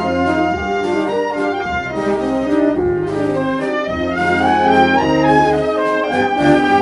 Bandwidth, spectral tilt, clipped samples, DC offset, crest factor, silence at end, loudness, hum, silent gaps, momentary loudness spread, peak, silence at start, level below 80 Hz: 11.5 kHz; -6.5 dB/octave; under 0.1%; under 0.1%; 14 dB; 0 s; -16 LUFS; none; none; 7 LU; 0 dBFS; 0 s; -40 dBFS